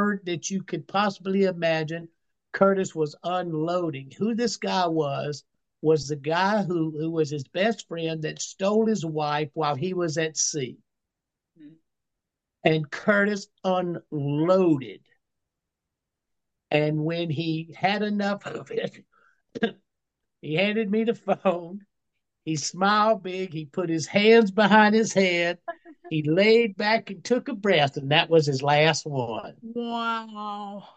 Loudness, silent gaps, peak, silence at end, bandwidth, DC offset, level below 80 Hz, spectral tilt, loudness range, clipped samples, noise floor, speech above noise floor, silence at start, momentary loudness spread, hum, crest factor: -24 LUFS; none; -4 dBFS; 0.1 s; 8.8 kHz; under 0.1%; -72 dBFS; -4.5 dB/octave; 8 LU; under 0.1%; -85 dBFS; 61 dB; 0 s; 13 LU; none; 20 dB